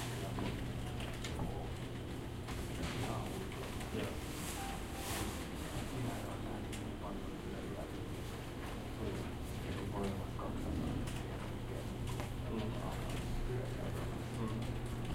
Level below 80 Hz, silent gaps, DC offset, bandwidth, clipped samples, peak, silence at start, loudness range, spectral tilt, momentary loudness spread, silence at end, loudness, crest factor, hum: -48 dBFS; none; under 0.1%; 16 kHz; under 0.1%; -22 dBFS; 0 s; 2 LU; -5.5 dB/octave; 4 LU; 0 s; -42 LUFS; 20 dB; none